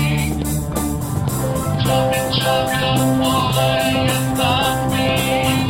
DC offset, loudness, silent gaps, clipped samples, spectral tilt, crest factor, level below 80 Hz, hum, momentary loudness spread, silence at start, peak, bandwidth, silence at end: under 0.1%; -18 LUFS; none; under 0.1%; -5 dB/octave; 14 dB; -34 dBFS; none; 5 LU; 0 s; -4 dBFS; 16.5 kHz; 0 s